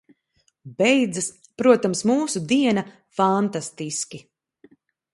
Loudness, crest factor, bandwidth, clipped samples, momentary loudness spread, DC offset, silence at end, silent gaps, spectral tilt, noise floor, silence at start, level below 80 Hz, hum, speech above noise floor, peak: -22 LUFS; 20 dB; 11.5 kHz; under 0.1%; 12 LU; under 0.1%; 0.95 s; none; -4.5 dB/octave; -68 dBFS; 0.65 s; -68 dBFS; none; 47 dB; -2 dBFS